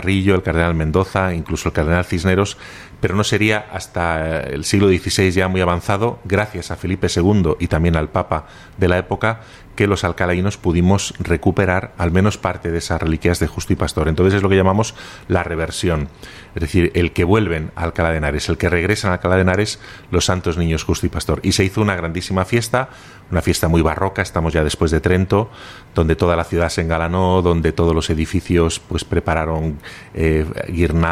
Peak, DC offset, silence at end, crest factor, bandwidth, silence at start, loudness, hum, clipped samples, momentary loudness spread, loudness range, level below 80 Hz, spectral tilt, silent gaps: -2 dBFS; under 0.1%; 0 s; 14 dB; 14.5 kHz; 0 s; -18 LUFS; none; under 0.1%; 8 LU; 2 LU; -30 dBFS; -5.5 dB/octave; none